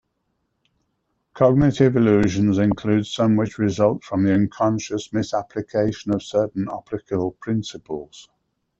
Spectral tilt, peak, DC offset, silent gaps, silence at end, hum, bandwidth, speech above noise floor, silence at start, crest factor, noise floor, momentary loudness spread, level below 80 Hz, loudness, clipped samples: -7 dB/octave; -4 dBFS; under 0.1%; none; 0.6 s; none; 8 kHz; 53 dB; 1.35 s; 18 dB; -73 dBFS; 10 LU; -48 dBFS; -21 LUFS; under 0.1%